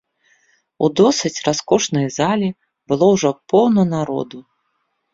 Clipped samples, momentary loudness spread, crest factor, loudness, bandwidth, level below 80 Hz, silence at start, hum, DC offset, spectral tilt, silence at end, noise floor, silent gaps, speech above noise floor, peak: under 0.1%; 9 LU; 16 dB; -17 LUFS; 7.8 kHz; -56 dBFS; 0.8 s; none; under 0.1%; -5 dB/octave; 0.7 s; -70 dBFS; none; 53 dB; -2 dBFS